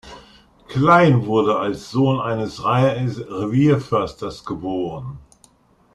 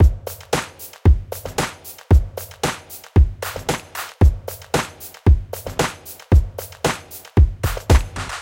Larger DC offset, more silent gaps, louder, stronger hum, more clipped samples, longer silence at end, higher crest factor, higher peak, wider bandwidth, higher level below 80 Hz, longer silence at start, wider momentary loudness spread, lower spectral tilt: neither; neither; about the same, -19 LUFS vs -20 LUFS; neither; neither; first, 0.75 s vs 0 s; about the same, 18 dB vs 18 dB; about the same, -2 dBFS vs 0 dBFS; second, 11 kHz vs 17 kHz; second, -50 dBFS vs -22 dBFS; about the same, 0.05 s vs 0 s; about the same, 15 LU vs 13 LU; first, -7.5 dB/octave vs -5.5 dB/octave